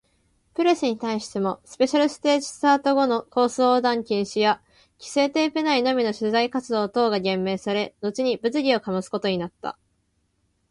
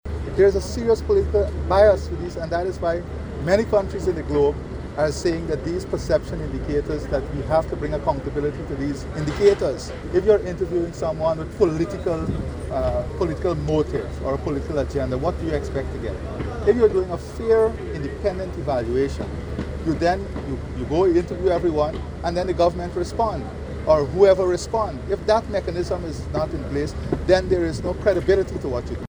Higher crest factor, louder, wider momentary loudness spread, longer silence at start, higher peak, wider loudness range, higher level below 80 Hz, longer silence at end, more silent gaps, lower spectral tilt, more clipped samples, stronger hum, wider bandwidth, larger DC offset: about the same, 16 dB vs 18 dB; about the same, -23 LUFS vs -23 LUFS; about the same, 8 LU vs 10 LU; first, 0.6 s vs 0.05 s; about the same, -6 dBFS vs -4 dBFS; about the same, 3 LU vs 4 LU; second, -64 dBFS vs -34 dBFS; first, 1 s vs 0 s; neither; second, -4.5 dB/octave vs -7 dB/octave; neither; neither; second, 11.5 kHz vs over 20 kHz; neither